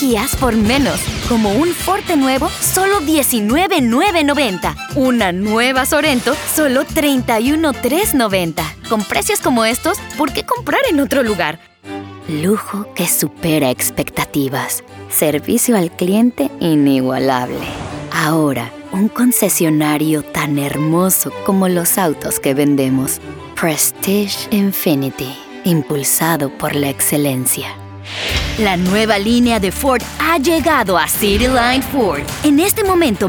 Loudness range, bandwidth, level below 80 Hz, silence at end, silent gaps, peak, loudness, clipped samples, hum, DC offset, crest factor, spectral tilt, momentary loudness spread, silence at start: 3 LU; over 20 kHz; -36 dBFS; 0 s; none; 0 dBFS; -15 LUFS; under 0.1%; none; under 0.1%; 14 dB; -4 dB/octave; 7 LU; 0 s